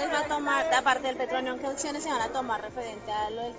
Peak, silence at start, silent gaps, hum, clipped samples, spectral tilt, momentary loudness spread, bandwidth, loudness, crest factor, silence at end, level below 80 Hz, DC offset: -12 dBFS; 0 s; none; none; under 0.1%; -2.5 dB/octave; 9 LU; 8 kHz; -29 LUFS; 18 dB; 0 s; -58 dBFS; under 0.1%